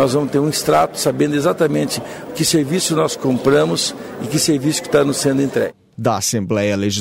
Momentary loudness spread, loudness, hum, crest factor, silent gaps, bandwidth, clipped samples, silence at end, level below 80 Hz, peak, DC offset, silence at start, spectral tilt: 7 LU; -17 LUFS; none; 14 dB; none; 16.5 kHz; under 0.1%; 0 s; -52 dBFS; -4 dBFS; under 0.1%; 0 s; -4.5 dB/octave